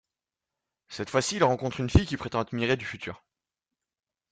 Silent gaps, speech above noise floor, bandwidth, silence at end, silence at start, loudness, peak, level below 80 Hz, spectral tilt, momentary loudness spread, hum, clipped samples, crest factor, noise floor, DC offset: none; 62 dB; 9.6 kHz; 1.15 s; 0.9 s; -27 LUFS; -4 dBFS; -42 dBFS; -5 dB/octave; 13 LU; none; under 0.1%; 24 dB; -89 dBFS; under 0.1%